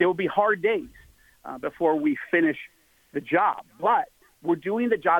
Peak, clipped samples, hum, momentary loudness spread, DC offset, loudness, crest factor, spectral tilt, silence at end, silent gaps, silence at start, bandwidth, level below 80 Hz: -8 dBFS; under 0.1%; none; 14 LU; under 0.1%; -25 LUFS; 18 dB; -7 dB/octave; 0 s; none; 0 s; 17.5 kHz; -64 dBFS